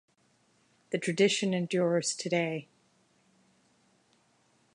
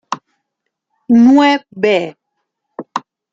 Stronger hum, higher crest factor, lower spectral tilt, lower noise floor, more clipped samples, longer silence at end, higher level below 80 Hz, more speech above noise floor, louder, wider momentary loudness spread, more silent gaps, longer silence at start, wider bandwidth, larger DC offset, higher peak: neither; first, 22 dB vs 14 dB; second, -4 dB/octave vs -5.5 dB/octave; second, -69 dBFS vs -75 dBFS; neither; first, 2.1 s vs 0.35 s; second, -82 dBFS vs -62 dBFS; second, 40 dB vs 65 dB; second, -29 LUFS vs -11 LUFS; second, 9 LU vs 18 LU; neither; first, 0.9 s vs 0.1 s; first, 11 kHz vs 7.6 kHz; neither; second, -12 dBFS vs -2 dBFS